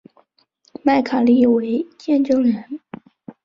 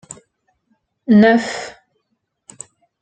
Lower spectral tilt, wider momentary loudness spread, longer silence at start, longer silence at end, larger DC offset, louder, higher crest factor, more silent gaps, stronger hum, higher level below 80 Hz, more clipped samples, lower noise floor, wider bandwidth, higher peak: about the same, -7 dB/octave vs -6 dB/octave; second, 17 LU vs 27 LU; second, 0.85 s vs 1.1 s; second, 0.15 s vs 1.3 s; neither; second, -18 LUFS vs -14 LUFS; about the same, 16 dB vs 18 dB; neither; neither; about the same, -60 dBFS vs -58 dBFS; neither; second, -61 dBFS vs -71 dBFS; second, 6.8 kHz vs 9.2 kHz; about the same, -4 dBFS vs -2 dBFS